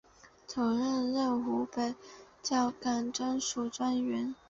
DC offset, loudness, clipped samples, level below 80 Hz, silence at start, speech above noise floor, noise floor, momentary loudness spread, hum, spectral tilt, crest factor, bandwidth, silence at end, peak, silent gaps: under 0.1%; -33 LUFS; under 0.1%; -68 dBFS; 0.25 s; 19 dB; -52 dBFS; 7 LU; none; -3.5 dB/octave; 14 dB; 7.8 kHz; 0.15 s; -20 dBFS; none